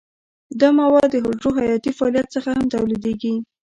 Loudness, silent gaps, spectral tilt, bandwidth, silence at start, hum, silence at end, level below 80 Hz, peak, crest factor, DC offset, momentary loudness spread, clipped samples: -19 LUFS; none; -6.5 dB/octave; 10 kHz; 0.5 s; none; 0.2 s; -50 dBFS; -2 dBFS; 16 dB; under 0.1%; 8 LU; under 0.1%